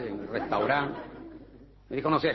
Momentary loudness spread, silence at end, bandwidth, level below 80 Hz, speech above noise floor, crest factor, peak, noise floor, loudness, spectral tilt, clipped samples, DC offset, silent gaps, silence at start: 20 LU; 0 s; 6 kHz; -56 dBFS; 24 dB; 18 dB; -12 dBFS; -52 dBFS; -29 LUFS; -8 dB/octave; under 0.1%; under 0.1%; none; 0 s